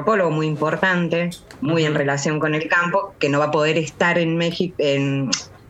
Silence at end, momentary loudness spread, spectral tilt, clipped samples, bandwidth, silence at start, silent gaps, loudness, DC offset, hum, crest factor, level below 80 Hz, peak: 0.15 s; 4 LU; -5 dB/octave; under 0.1%; 12.5 kHz; 0 s; none; -20 LUFS; under 0.1%; none; 18 dB; -58 dBFS; -2 dBFS